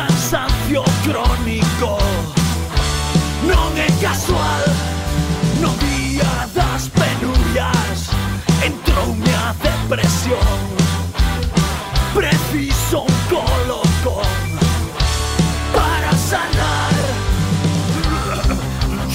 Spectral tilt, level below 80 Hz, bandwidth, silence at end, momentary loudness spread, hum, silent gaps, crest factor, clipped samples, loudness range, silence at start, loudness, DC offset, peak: -5 dB/octave; -22 dBFS; 16.5 kHz; 0 s; 3 LU; none; none; 14 dB; under 0.1%; 1 LU; 0 s; -17 LUFS; under 0.1%; -2 dBFS